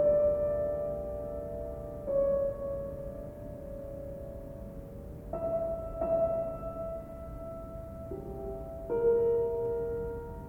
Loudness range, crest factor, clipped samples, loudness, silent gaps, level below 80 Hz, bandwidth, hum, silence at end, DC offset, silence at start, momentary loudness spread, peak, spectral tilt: 5 LU; 16 dB; under 0.1%; -34 LUFS; none; -48 dBFS; 17.5 kHz; none; 0 s; under 0.1%; 0 s; 15 LU; -18 dBFS; -9.5 dB/octave